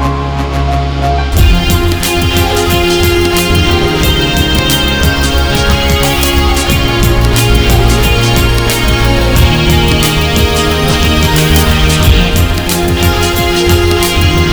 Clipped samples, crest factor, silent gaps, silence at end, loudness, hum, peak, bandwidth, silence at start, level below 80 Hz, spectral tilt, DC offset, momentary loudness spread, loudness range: 0.5%; 8 dB; none; 0 s; -10 LUFS; none; 0 dBFS; over 20 kHz; 0 s; -14 dBFS; -4.5 dB/octave; under 0.1%; 3 LU; 1 LU